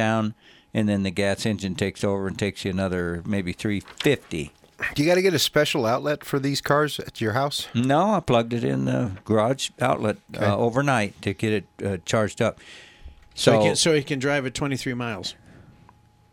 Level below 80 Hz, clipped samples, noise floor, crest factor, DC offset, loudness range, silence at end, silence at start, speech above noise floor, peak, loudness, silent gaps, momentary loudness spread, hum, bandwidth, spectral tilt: -54 dBFS; under 0.1%; -55 dBFS; 20 dB; under 0.1%; 3 LU; 1 s; 0 s; 31 dB; -4 dBFS; -24 LUFS; none; 9 LU; none; 17 kHz; -5 dB/octave